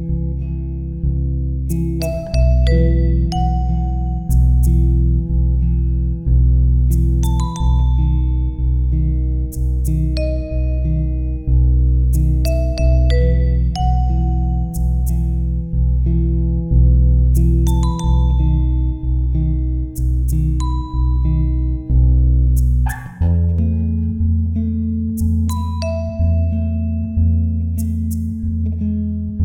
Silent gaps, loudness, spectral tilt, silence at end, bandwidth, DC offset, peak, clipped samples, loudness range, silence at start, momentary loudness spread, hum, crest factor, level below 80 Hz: none; -18 LUFS; -8 dB/octave; 0 s; 14 kHz; under 0.1%; -2 dBFS; under 0.1%; 3 LU; 0 s; 6 LU; none; 12 dB; -16 dBFS